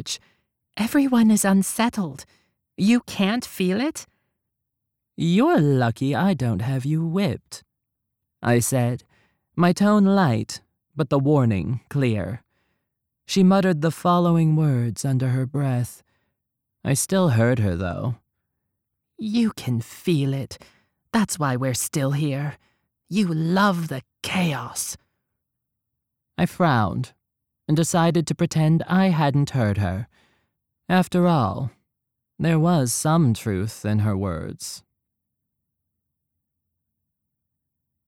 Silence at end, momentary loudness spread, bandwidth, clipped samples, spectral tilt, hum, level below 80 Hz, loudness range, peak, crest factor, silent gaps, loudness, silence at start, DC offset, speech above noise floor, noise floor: 3.3 s; 14 LU; 16.5 kHz; under 0.1%; -6 dB/octave; none; -54 dBFS; 5 LU; -6 dBFS; 16 dB; none; -22 LUFS; 0 s; under 0.1%; 60 dB; -81 dBFS